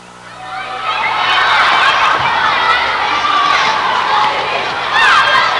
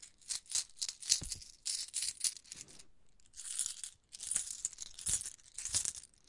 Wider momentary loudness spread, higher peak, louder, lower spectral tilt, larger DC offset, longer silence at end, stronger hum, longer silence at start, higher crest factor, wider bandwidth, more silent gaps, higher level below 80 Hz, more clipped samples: second, 9 LU vs 15 LU; first, -2 dBFS vs -6 dBFS; first, -11 LUFS vs -37 LUFS; first, -1.5 dB/octave vs 1.5 dB/octave; first, 0.2% vs under 0.1%; second, 0 s vs 0.2 s; first, 60 Hz at -45 dBFS vs none; about the same, 0 s vs 0 s; second, 12 dB vs 36 dB; about the same, 11.5 kHz vs 11.5 kHz; neither; first, -48 dBFS vs -64 dBFS; neither